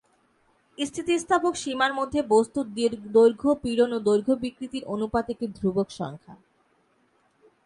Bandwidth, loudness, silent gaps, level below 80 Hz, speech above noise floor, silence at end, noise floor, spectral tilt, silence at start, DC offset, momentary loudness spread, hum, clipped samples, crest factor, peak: 11.5 kHz; -25 LUFS; none; -56 dBFS; 42 dB; 1.3 s; -66 dBFS; -5 dB/octave; 0.8 s; under 0.1%; 12 LU; none; under 0.1%; 18 dB; -8 dBFS